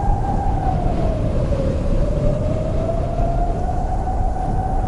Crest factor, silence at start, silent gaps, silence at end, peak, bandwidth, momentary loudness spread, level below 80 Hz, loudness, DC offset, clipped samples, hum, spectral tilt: 14 dB; 0 s; none; 0 s; -4 dBFS; 10.5 kHz; 2 LU; -22 dBFS; -22 LUFS; under 0.1%; under 0.1%; none; -8.5 dB/octave